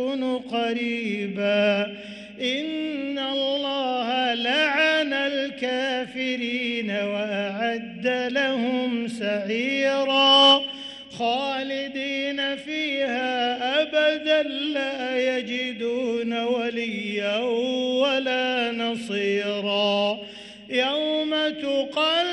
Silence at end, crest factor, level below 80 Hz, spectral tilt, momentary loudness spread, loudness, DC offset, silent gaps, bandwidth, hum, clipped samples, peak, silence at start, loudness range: 0 s; 20 dB; -68 dBFS; -4 dB/octave; 7 LU; -23 LUFS; under 0.1%; none; 11 kHz; none; under 0.1%; -4 dBFS; 0 s; 5 LU